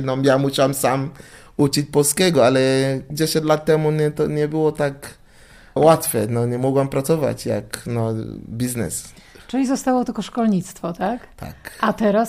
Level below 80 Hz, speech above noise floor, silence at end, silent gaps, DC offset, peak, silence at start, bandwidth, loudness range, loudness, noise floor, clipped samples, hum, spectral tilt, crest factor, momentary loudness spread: -48 dBFS; 27 dB; 0 s; none; under 0.1%; -2 dBFS; 0 s; 15.5 kHz; 5 LU; -20 LUFS; -46 dBFS; under 0.1%; none; -5 dB/octave; 16 dB; 14 LU